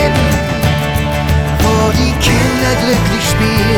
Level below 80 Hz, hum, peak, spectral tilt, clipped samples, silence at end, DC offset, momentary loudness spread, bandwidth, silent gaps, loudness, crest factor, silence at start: -20 dBFS; none; -2 dBFS; -5 dB/octave; under 0.1%; 0 s; under 0.1%; 3 LU; over 20 kHz; none; -12 LUFS; 10 dB; 0 s